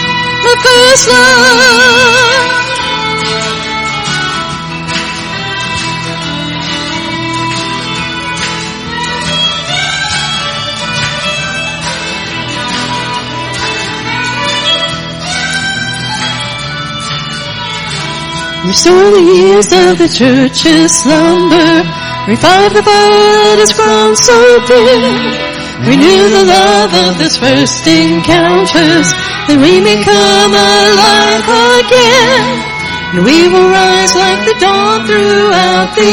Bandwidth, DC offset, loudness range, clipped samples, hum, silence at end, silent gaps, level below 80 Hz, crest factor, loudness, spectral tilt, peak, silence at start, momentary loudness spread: over 20 kHz; 0.3%; 9 LU; 1%; none; 0 s; none; -36 dBFS; 8 dB; -8 LUFS; -3 dB/octave; 0 dBFS; 0 s; 11 LU